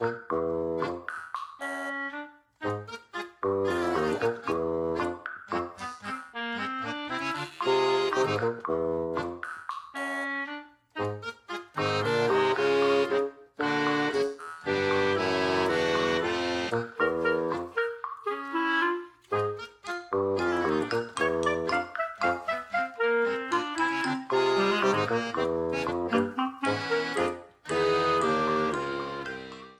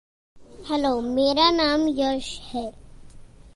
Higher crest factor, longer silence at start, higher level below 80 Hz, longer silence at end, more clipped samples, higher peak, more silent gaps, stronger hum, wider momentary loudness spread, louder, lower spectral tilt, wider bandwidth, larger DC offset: about the same, 16 dB vs 18 dB; second, 0 s vs 0.35 s; second, -60 dBFS vs -48 dBFS; about the same, 0.05 s vs 0.1 s; neither; second, -12 dBFS vs -6 dBFS; neither; neither; about the same, 12 LU vs 14 LU; second, -29 LUFS vs -23 LUFS; about the same, -5 dB/octave vs -4 dB/octave; about the same, 12.5 kHz vs 11.5 kHz; neither